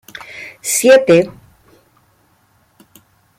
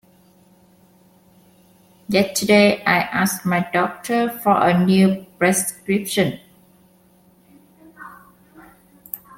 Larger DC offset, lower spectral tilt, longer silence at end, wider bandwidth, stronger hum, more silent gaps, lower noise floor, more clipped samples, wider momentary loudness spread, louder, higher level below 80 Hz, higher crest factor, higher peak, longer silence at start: neither; about the same, -3.5 dB/octave vs -4.5 dB/octave; first, 2.1 s vs 0.2 s; about the same, 16 kHz vs 16.5 kHz; neither; neither; about the same, -56 dBFS vs -54 dBFS; neither; first, 22 LU vs 19 LU; first, -12 LUFS vs -18 LUFS; about the same, -58 dBFS vs -60 dBFS; about the same, 16 dB vs 18 dB; about the same, -2 dBFS vs -2 dBFS; second, 0.35 s vs 2.1 s